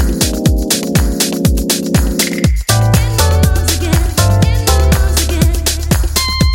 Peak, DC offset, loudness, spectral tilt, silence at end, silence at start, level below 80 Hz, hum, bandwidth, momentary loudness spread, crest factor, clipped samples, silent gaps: 0 dBFS; under 0.1%; -13 LUFS; -4.5 dB/octave; 0 s; 0 s; -16 dBFS; none; 17 kHz; 3 LU; 12 dB; under 0.1%; none